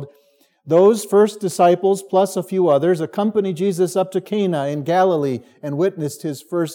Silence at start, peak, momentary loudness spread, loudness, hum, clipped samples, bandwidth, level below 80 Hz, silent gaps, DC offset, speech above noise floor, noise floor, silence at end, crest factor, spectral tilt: 0 s; -2 dBFS; 10 LU; -18 LUFS; none; under 0.1%; 17.5 kHz; -78 dBFS; none; under 0.1%; 40 dB; -58 dBFS; 0 s; 16 dB; -6 dB/octave